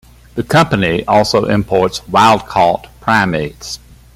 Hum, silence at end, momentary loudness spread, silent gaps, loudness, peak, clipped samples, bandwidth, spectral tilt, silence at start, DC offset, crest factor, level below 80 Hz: none; 0.4 s; 14 LU; none; -13 LUFS; 0 dBFS; under 0.1%; 16 kHz; -5 dB/octave; 0.35 s; under 0.1%; 14 dB; -40 dBFS